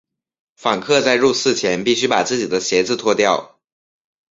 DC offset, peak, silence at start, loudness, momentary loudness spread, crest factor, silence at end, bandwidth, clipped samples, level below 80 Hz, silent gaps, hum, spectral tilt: under 0.1%; -2 dBFS; 0.6 s; -17 LUFS; 6 LU; 16 dB; 0.85 s; 7.8 kHz; under 0.1%; -58 dBFS; none; none; -3 dB/octave